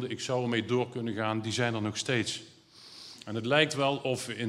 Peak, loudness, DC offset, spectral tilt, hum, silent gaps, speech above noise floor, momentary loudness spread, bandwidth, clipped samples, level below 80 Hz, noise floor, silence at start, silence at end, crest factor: -8 dBFS; -30 LUFS; under 0.1%; -4.5 dB/octave; none; none; 22 dB; 15 LU; 14.5 kHz; under 0.1%; -76 dBFS; -52 dBFS; 0 s; 0 s; 24 dB